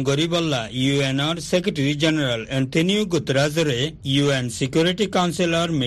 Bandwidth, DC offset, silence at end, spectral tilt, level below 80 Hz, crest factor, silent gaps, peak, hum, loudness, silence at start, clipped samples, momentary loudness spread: 12.5 kHz; under 0.1%; 0 s; -5 dB/octave; -50 dBFS; 16 dB; none; -6 dBFS; none; -21 LUFS; 0 s; under 0.1%; 3 LU